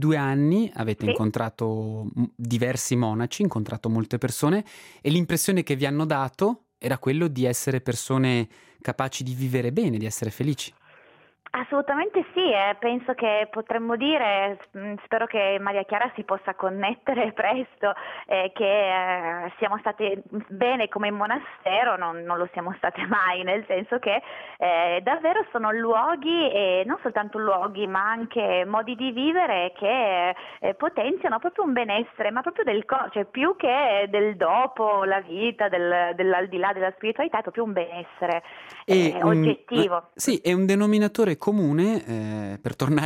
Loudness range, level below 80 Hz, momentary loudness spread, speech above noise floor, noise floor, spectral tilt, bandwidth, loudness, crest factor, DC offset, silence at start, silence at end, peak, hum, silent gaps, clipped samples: 3 LU; -66 dBFS; 7 LU; 32 dB; -56 dBFS; -5 dB/octave; 16 kHz; -24 LUFS; 18 dB; under 0.1%; 0 s; 0 s; -6 dBFS; none; none; under 0.1%